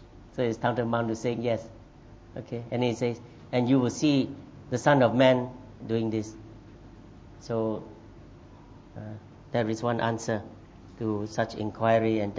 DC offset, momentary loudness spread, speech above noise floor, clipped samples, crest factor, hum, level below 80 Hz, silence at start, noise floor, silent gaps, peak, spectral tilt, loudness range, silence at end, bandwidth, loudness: under 0.1%; 21 LU; 23 dB; under 0.1%; 22 dB; none; -56 dBFS; 0 s; -50 dBFS; none; -8 dBFS; -6.5 dB/octave; 9 LU; 0 s; 8 kHz; -28 LUFS